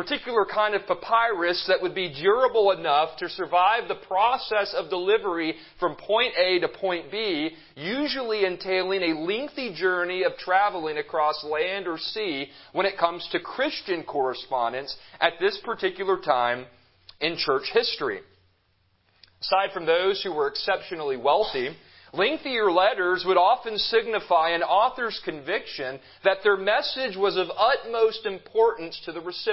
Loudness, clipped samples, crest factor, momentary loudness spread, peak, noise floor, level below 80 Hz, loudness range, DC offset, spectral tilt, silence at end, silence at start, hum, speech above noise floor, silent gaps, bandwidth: -25 LUFS; under 0.1%; 22 dB; 9 LU; -4 dBFS; -67 dBFS; -64 dBFS; 4 LU; under 0.1%; -7.5 dB/octave; 0 s; 0 s; none; 42 dB; none; 5.8 kHz